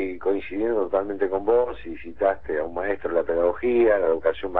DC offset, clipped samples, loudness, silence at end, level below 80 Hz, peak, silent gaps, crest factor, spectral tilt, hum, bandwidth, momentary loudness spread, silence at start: 1%; under 0.1%; -24 LUFS; 0 s; -48 dBFS; -6 dBFS; none; 16 dB; -9 dB/octave; none; 4.1 kHz; 8 LU; 0 s